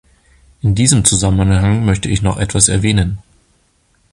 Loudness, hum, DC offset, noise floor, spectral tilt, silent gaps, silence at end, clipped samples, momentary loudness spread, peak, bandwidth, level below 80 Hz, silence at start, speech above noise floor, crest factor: -13 LUFS; none; under 0.1%; -57 dBFS; -4.5 dB/octave; none; 0.95 s; under 0.1%; 8 LU; 0 dBFS; 12.5 kHz; -28 dBFS; 0.65 s; 44 dB; 14 dB